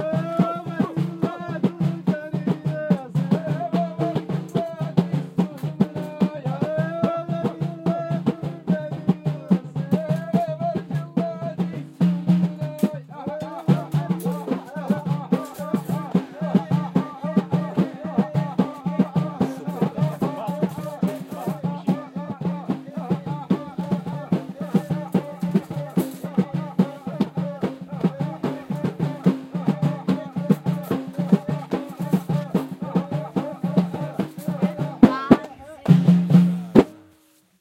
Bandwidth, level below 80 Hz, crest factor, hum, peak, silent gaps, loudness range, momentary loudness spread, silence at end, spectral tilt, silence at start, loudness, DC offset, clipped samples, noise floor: 15.5 kHz; -58 dBFS; 22 dB; none; 0 dBFS; none; 4 LU; 9 LU; 0.6 s; -8.5 dB/octave; 0 s; -24 LUFS; under 0.1%; under 0.1%; -58 dBFS